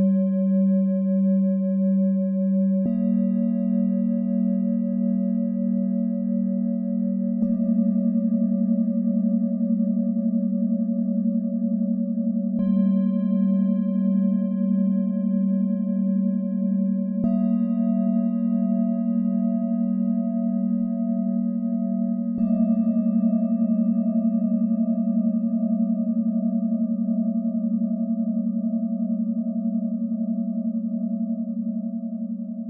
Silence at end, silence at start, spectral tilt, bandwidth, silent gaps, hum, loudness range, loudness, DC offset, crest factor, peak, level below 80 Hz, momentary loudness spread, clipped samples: 0 s; 0 s; -15 dB/octave; 2 kHz; none; none; 3 LU; -23 LUFS; under 0.1%; 10 dB; -12 dBFS; -66 dBFS; 4 LU; under 0.1%